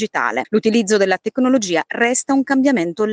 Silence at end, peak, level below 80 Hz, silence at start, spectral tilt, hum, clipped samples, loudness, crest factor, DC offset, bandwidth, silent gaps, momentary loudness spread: 0 s; -4 dBFS; -64 dBFS; 0 s; -4 dB/octave; none; under 0.1%; -17 LUFS; 14 dB; under 0.1%; 9.8 kHz; none; 3 LU